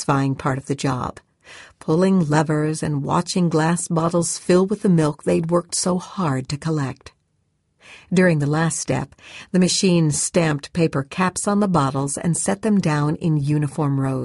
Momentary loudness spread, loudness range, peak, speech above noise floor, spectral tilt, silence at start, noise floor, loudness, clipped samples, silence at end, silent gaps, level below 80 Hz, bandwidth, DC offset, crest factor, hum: 7 LU; 3 LU; -4 dBFS; 48 dB; -5.5 dB/octave; 0 s; -68 dBFS; -20 LUFS; under 0.1%; 0 s; none; -52 dBFS; 11.5 kHz; under 0.1%; 16 dB; none